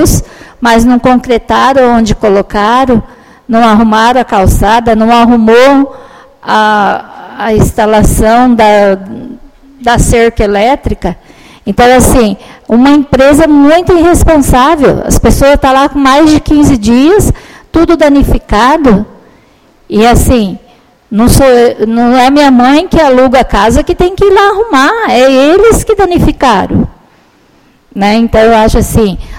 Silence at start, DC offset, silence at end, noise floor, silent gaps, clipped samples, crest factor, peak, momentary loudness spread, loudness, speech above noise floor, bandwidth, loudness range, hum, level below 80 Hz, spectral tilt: 0 s; 0.6%; 0 s; -44 dBFS; none; 3%; 6 dB; 0 dBFS; 9 LU; -6 LUFS; 39 dB; 17 kHz; 3 LU; none; -18 dBFS; -5.5 dB/octave